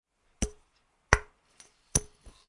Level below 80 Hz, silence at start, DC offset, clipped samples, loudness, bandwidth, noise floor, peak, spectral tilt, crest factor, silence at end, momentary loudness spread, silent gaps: -42 dBFS; 0.4 s; under 0.1%; under 0.1%; -30 LUFS; 11.5 kHz; -70 dBFS; 0 dBFS; -3 dB/octave; 34 dB; 0.45 s; 9 LU; none